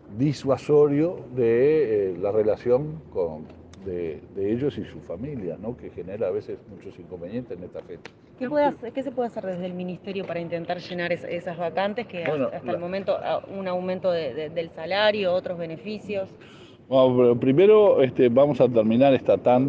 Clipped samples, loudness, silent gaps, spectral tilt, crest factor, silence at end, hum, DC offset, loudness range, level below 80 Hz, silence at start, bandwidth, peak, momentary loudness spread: under 0.1%; -24 LUFS; none; -8 dB/octave; 16 dB; 0 s; none; under 0.1%; 11 LU; -62 dBFS; 0.1 s; 7.8 kHz; -6 dBFS; 17 LU